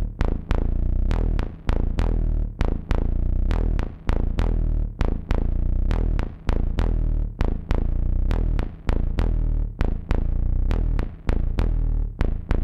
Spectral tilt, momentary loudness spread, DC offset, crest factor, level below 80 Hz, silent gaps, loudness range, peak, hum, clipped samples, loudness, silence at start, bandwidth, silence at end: -8.5 dB/octave; 3 LU; under 0.1%; 16 dB; -22 dBFS; none; 0 LU; -6 dBFS; none; under 0.1%; -27 LUFS; 0 s; 5.8 kHz; 0 s